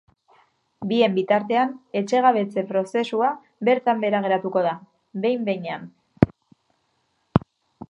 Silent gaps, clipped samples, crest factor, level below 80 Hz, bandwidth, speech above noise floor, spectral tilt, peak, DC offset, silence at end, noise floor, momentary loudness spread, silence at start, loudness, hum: none; under 0.1%; 22 dB; -50 dBFS; 10.5 kHz; 48 dB; -7 dB/octave; 0 dBFS; under 0.1%; 0.05 s; -70 dBFS; 9 LU; 0.8 s; -22 LUFS; none